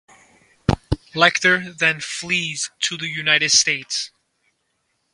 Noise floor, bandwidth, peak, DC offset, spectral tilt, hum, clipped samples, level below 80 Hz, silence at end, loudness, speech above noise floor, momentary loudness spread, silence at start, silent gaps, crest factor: -71 dBFS; 11.5 kHz; 0 dBFS; under 0.1%; -2 dB/octave; none; under 0.1%; -40 dBFS; 1.05 s; -19 LUFS; 51 dB; 12 LU; 0.7 s; none; 22 dB